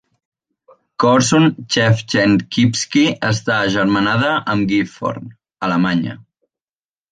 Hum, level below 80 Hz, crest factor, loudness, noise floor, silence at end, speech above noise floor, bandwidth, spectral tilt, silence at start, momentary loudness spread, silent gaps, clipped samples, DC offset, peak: none; -50 dBFS; 16 dB; -16 LUFS; under -90 dBFS; 0.9 s; over 74 dB; 9.8 kHz; -5 dB/octave; 1 s; 10 LU; none; under 0.1%; under 0.1%; -2 dBFS